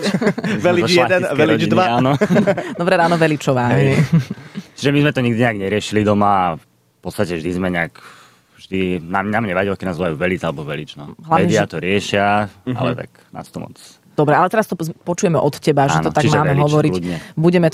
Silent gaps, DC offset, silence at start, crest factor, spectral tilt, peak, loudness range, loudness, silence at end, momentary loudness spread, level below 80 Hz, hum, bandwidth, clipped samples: none; under 0.1%; 0 s; 14 dB; -6 dB/octave; -2 dBFS; 6 LU; -17 LUFS; 0 s; 13 LU; -50 dBFS; none; 15 kHz; under 0.1%